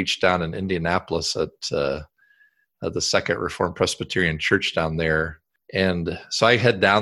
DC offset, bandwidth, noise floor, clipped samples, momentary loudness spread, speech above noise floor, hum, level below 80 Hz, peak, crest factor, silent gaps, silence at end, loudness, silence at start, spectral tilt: under 0.1%; 12.5 kHz; -61 dBFS; under 0.1%; 10 LU; 39 dB; none; -44 dBFS; -2 dBFS; 20 dB; none; 0 s; -22 LUFS; 0 s; -4 dB/octave